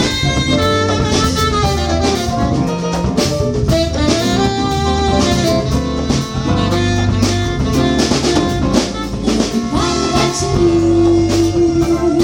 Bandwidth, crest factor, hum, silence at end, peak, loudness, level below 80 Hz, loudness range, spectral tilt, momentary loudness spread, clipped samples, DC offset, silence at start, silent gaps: 17.5 kHz; 14 dB; none; 0 s; 0 dBFS; -15 LUFS; -26 dBFS; 1 LU; -5 dB/octave; 4 LU; under 0.1%; under 0.1%; 0 s; none